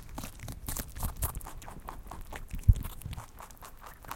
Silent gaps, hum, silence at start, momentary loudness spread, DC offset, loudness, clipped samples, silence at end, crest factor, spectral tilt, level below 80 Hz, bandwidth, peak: none; none; 0 s; 20 LU; under 0.1%; -36 LUFS; under 0.1%; 0 s; 28 dB; -5 dB/octave; -38 dBFS; 17 kHz; -6 dBFS